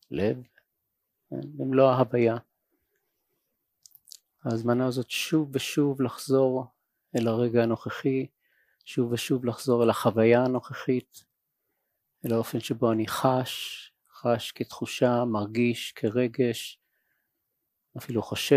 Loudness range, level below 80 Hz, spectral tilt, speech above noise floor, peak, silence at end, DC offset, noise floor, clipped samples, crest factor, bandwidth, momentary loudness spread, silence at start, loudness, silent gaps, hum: 4 LU; -68 dBFS; -6 dB/octave; 55 dB; -8 dBFS; 0 s; under 0.1%; -81 dBFS; under 0.1%; 20 dB; 15.5 kHz; 13 LU; 0.1 s; -27 LUFS; none; none